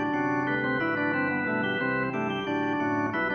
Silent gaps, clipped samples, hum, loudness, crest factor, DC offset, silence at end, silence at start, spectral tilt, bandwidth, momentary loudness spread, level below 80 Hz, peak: none; under 0.1%; none; -27 LUFS; 12 dB; under 0.1%; 0 s; 0 s; -7 dB/octave; 6.6 kHz; 2 LU; -62 dBFS; -14 dBFS